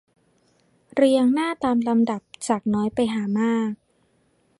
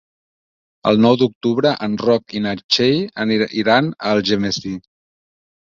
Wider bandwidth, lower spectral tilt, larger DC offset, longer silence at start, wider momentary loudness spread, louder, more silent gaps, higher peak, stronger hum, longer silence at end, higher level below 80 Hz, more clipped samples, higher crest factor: first, 11.5 kHz vs 7.4 kHz; about the same, -5.5 dB/octave vs -5.5 dB/octave; neither; about the same, 0.95 s vs 0.85 s; about the same, 11 LU vs 9 LU; second, -22 LUFS vs -17 LUFS; second, none vs 1.35-1.41 s, 2.64-2.69 s; second, -6 dBFS vs 0 dBFS; neither; about the same, 0.85 s vs 0.9 s; second, -62 dBFS vs -54 dBFS; neither; about the same, 18 dB vs 18 dB